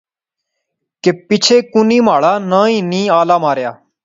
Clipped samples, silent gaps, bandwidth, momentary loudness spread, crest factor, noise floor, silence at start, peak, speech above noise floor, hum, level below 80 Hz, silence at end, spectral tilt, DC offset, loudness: under 0.1%; none; 7.8 kHz; 7 LU; 14 dB; -79 dBFS; 1.05 s; 0 dBFS; 67 dB; none; -62 dBFS; 0.3 s; -4.5 dB/octave; under 0.1%; -12 LUFS